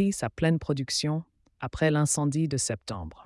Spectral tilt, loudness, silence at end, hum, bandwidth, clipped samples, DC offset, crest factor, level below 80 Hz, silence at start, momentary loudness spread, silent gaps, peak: -5 dB/octave; -27 LUFS; 0.1 s; none; 12 kHz; under 0.1%; under 0.1%; 16 dB; -52 dBFS; 0 s; 11 LU; none; -10 dBFS